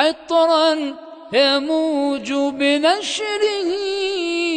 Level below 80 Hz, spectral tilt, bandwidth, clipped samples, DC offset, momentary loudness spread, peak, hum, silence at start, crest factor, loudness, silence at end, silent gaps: -64 dBFS; -2 dB/octave; 9.4 kHz; under 0.1%; under 0.1%; 6 LU; -2 dBFS; none; 0 s; 16 dB; -18 LUFS; 0 s; none